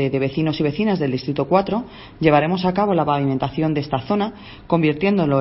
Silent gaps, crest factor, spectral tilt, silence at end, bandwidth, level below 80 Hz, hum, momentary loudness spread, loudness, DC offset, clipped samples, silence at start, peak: none; 18 dB; -10.5 dB/octave; 0 s; 5.8 kHz; -46 dBFS; none; 6 LU; -20 LUFS; under 0.1%; under 0.1%; 0 s; 0 dBFS